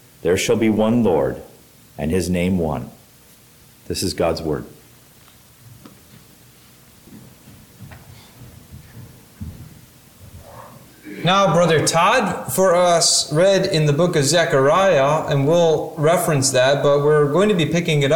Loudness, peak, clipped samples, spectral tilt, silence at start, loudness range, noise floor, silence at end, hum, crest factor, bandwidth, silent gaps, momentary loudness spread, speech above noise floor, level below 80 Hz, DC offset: -17 LUFS; -4 dBFS; under 0.1%; -4.5 dB/octave; 0.25 s; 12 LU; -49 dBFS; 0 s; none; 14 dB; 19 kHz; none; 12 LU; 32 dB; -46 dBFS; under 0.1%